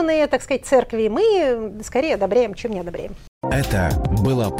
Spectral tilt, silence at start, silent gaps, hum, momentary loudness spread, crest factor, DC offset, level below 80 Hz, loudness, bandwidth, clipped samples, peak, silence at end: -6 dB/octave; 0 s; 3.28-3.41 s; none; 11 LU; 16 dB; under 0.1%; -34 dBFS; -20 LUFS; 16.5 kHz; under 0.1%; -4 dBFS; 0 s